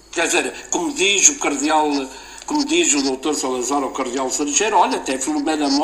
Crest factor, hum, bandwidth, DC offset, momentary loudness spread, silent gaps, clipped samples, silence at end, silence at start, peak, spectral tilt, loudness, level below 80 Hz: 20 dB; none; 15.5 kHz; under 0.1%; 10 LU; none; under 0.1%; 0 s; 0.1 s; 0 dBFS; -0.5 dB/octave; -18 LUFS; -52 dBFS